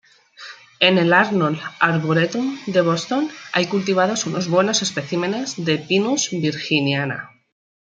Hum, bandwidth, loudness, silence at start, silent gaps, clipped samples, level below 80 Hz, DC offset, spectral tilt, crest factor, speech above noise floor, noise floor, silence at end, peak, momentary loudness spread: none; 9.4 kHz; -19 LUFS; 0.4 s; none; under 0.1%; -66 dBFS; under 0.1%; -4 dB/octave; 20 dB; 22 dB; -41 dBFS; 0.7 s; 0 dBFS; 8 LU